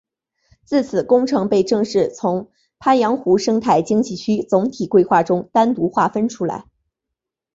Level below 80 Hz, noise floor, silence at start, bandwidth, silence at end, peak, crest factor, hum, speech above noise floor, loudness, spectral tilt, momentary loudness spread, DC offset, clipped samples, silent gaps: -58 dBFS; -82 dBFS; 0.7 s; 7.8 kHz; 0.95 s; -2 dBFS; 16 dB; none; 65 dB; -18 LUFS; -6 dB/octave; 6 LU; under 0.1%; under 0.1%; none